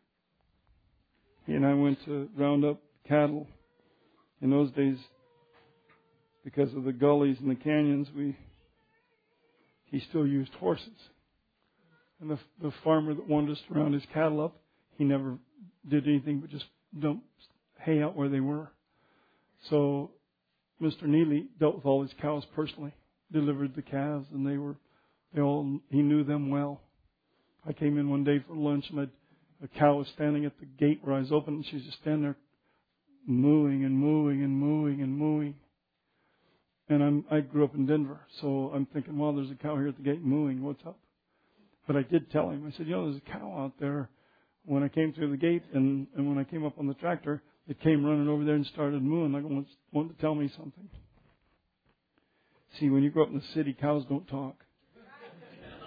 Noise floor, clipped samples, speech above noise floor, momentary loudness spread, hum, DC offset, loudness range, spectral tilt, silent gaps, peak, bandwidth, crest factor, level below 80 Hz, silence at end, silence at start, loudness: -80 dBFS; under 0.1%; 51 dB; 13 LU; none; under 0.1%; 4 LU; -10.5 dB/octave; none; -10 dBFS; 5 kHz; 22 dB; -70 dBFS; 0 s; 1.5 s; -30 LUFS